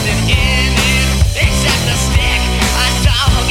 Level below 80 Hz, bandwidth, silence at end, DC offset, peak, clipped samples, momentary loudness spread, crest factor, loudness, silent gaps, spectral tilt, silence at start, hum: -16 dBFS; 16.5 kHz; 0 s; under 0.1%; 0 dBFS; under 0.1%; 2 LU; 12 dB; -12 LUFS; none; -3.5 dB/octave; 0 s; none